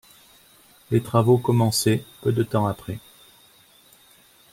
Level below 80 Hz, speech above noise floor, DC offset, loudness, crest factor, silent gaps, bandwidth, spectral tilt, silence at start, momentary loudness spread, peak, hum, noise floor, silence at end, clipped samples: -58 dBFS; 34 dB; under 0.1%; -22 LUFS; 20 dB; none; 16.5 kHz; -6 dB/octave; 0.9 s; 12 LU; -4 dBFS; none; -55 dBFS; 1.55 s; under 0.1%